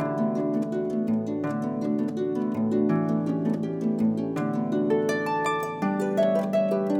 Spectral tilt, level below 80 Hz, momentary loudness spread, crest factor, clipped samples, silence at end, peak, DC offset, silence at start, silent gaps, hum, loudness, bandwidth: -7.5 dB/octave; -66 dBFS; 4 LU; 12 dB; under 0.1%; 0 s; -12 dBFS; under 0.1%; 0 s; none; none; -26 LUFS; 15.5 kHz